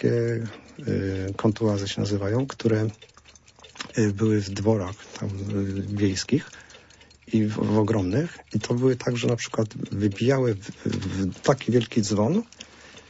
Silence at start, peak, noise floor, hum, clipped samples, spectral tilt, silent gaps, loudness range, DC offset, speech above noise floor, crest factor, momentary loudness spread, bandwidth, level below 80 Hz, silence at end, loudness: 0 s; -6 dBFS; -53 dBFS; none; under 0.1%; -6.5 dB/octave; none; 2 LU; under 0.1%; 28 dB; 20 dB; 9 LU; 8 kHz; -56 dBFS; 0.1 s; -25 LUFS